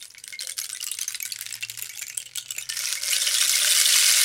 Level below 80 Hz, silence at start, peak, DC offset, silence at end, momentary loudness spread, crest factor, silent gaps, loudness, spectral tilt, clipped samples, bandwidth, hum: -74 dBFS; 0 s; 0 dBFS; under 0.1%; 0 s; 16 LU; 24 dB; none; -22 LUFS; 5 dB/octave; under 0.1%; 17 kHz; none